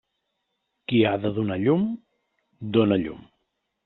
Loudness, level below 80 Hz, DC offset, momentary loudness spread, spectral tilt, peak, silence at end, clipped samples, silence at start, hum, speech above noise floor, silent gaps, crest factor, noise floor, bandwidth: -23 LUFS; -60 dBFS; under 0.1%; 16 LU; -6 dB/octave; -8 dBFS; 0.65 s; under 0.1%; 0.9 s; none; 55 dB; none; 18 dB; -78 dBFS; 4.2 kHz